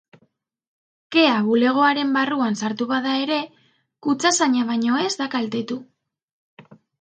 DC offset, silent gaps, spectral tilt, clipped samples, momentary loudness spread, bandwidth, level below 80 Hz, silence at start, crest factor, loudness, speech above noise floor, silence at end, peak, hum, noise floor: under 0.1%; 6.23-6.57 s; -3 dB/octave; under 0.1%; 9 LU; 9.6 kHz; -74 dBFS; 1.1 s; 20 dB; -20 LUFS; 46 dB; 0.4 s; -2 dBFS; none; -66 dBFS